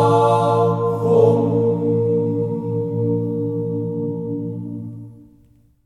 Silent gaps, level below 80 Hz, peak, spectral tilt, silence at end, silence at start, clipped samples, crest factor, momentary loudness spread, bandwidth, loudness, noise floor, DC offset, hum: none; -58 dBFS; -4 dBFS; -9 dB/octave; 0.65 s; 0 s; under 0.1%; 16 dB; 13 LU; 10.5 kHz; -19 LUFS; -53 dBFS; under 0.1%; none